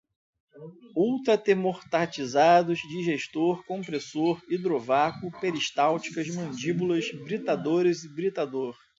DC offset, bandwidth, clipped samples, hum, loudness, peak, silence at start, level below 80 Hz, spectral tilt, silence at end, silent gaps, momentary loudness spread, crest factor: under 0.1%; 7.8 kHz; under 0.1%; none; -27 LUFS; -8 dBFS; 0.55 s; -70 dBFS; -5.5 dB/octave; 0.25 s; none; 10 LU; 20 dB